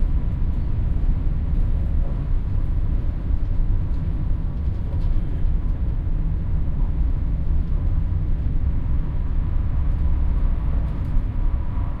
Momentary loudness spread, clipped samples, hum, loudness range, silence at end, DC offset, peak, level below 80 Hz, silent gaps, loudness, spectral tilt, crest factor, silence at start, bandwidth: 2 LU; under 0.1%; none; 1 LU; 0 s; under 0.1%; -8 dBFS; -20 dBFS; none; -26 LUFS; -10.5 dB/octave; 12 dB; 0 s; 3.4 kHz